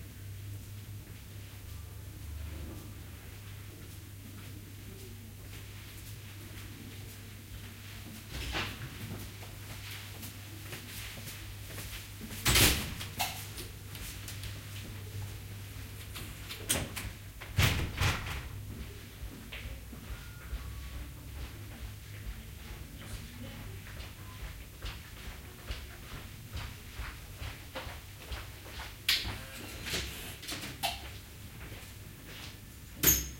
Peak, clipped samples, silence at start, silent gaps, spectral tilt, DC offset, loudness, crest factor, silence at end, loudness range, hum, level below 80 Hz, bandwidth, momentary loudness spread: -10 dBFS; under 0.1%; 0 s; none; -2.5 dB/octave; under 0.1%; -38 LUFS; 30 dB; 0 s; 14 LU; none; -48 dBFS; 16.5 kHz; 15 LU